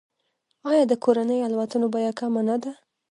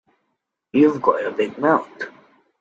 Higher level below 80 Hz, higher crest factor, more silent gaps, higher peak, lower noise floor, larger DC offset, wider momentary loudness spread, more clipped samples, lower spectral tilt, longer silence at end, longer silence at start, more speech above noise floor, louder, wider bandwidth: second, -78 dBFS vs -66 dBFS; about the same, 18 dB vs 20 dB; neither; second, -6 dBFS vs -2 dBFS; about the same, -74 dBFS vs -75 dBFS; neither; second, 7 LU vs 17 LU; neither; second, -6 dB/octave vs -7.5 dB/octave; second, 0.35 s vs 0.5 s; about the same, 0.65 s vs 0.75 s; second, 52 dB vs 57 dB; second, -23 LUFS vs -19 LUFS; first, 10.5 kHz vs 7.6 kHz